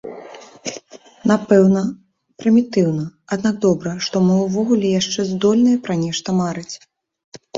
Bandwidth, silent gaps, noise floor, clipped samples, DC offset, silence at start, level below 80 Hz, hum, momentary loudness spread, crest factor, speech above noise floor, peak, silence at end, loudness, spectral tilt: 7.8 kHz; 7.24-7.32 s; -41 dBFS; under 0.1%; under 0.1%; 0.05 s; -58 dBFS; none; 16 LU; 16 dB; 24 dB; -2 dBFS; 0 s; -18 LUFS; -6 dB/octave